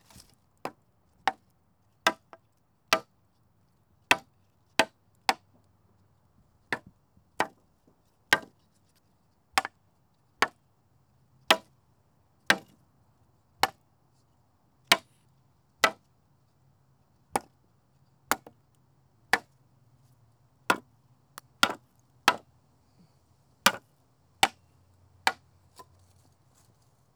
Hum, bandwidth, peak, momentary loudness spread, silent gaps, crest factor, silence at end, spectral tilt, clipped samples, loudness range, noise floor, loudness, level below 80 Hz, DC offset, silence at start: none; over 20 kHz; -6 dBFS; 17 LU; none; 28 dB; 1.85 s; -1 dB/octave; under 0.1%; 5 LU; -70 dBFS; -29 LUFS; -72 dBFS; under 0.1%; 0.65 s